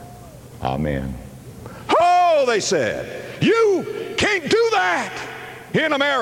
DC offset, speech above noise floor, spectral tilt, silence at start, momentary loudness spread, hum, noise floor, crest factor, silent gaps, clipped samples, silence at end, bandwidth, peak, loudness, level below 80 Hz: under 0.1%; 20 dB; -4 dB/octave; 0 s; 19 LU; none; -40 dBFS; 14 dB; none; under 0.1%; 0 s; 17 kHz; -6 dBFS; -19 LUFS; -44 dBFS